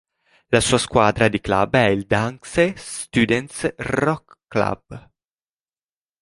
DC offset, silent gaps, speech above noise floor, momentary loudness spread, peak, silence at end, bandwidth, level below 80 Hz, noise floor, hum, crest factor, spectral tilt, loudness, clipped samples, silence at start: under 0.1%; none; over 70 dB; 9 LU; 0 dBFS; 1.25 s; 11.5 kHz; -44 dBFS; under -90 dBFS; none; 20 dB; -4.5 dB/octave; -20 LUFS; under 0.1%; 0.5 s